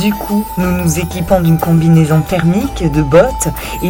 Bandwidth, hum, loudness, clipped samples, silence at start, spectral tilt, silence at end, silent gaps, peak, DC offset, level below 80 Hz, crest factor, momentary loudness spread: 17 kHz; none; -12 LUFS; 0.5%; 0 s; -6.5 dB/octave; 0 s; none; 0 dBFS; under 0.1%; -26 dBFS; 12 dB; 7 LU